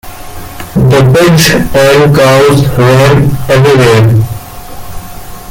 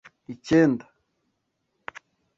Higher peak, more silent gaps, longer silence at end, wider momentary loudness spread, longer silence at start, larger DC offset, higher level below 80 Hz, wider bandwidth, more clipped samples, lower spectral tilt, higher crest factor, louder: first, 0 dBFS vs -8 dBFS; neither; second, 0 s vs 1.55 s; about the same, 21 LU vs 23 LU; second, 0.05 s vs 0.3 s; neither; first, -28 dBFS vs -62 dBFS; first, 17 kHz vs 7.6 kHz; first, 0.2% vs under 0.1%; second, -5.5 dB/octave vs -7 dB/octave; second, 6 dB vs 20 dB; first, -6 LUFS vs -22 LUFS